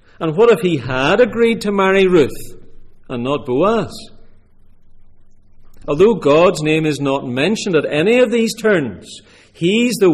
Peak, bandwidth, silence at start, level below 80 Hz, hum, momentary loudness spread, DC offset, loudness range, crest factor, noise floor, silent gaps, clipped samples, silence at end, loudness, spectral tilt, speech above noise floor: -2 dBFS; 15 kHz; 0.2 s; -42 dBFS; none; 13 LU; under 0.1%; 8 LU; 14 dB; -43 dBFS; none; under 0.1%; 0 s; -15 LUFS; -5.5 dB/octave; 28 dB